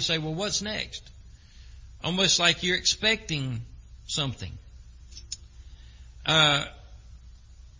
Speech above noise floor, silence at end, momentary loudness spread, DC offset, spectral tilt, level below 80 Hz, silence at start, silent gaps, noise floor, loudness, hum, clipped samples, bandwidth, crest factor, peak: 23 dB; 0.1 s; 22 LU; under 0.1%; -2.5 dB/octave; -48 dBFS; 0 s; none; -49 dBFS; -24 LUFS; none; under 0.1%; 7.8 kHz; 24 dB; -4 dBFS